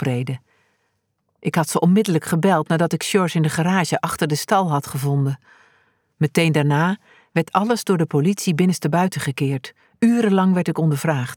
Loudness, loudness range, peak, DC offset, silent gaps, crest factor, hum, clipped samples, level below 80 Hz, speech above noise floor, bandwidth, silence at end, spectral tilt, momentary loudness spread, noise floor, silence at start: -20 LUFS; 2 LU; -4 dBFS; under 0.1%; none; 16 dB; none; under 0.1%; -62 dBFS; 52 dB; 18.5 kHz; 0 s; -6 dB/octave; 8 LU; -71 dBFS; 0 s